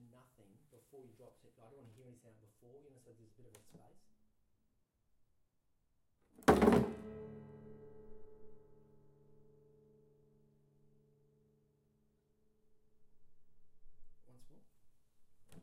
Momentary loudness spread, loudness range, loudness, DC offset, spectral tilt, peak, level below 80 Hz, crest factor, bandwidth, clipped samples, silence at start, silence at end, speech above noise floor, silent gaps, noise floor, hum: 32 LU; 20 LU; -32 LUFS; under 0.1%; -6.5 dB/octave; -14 dBFS; -62 dBFS; 30 dB; 16 kHz; under 0.1%; 0.95 s; 0.05 s; 17 dB; none; -79 dBFS; none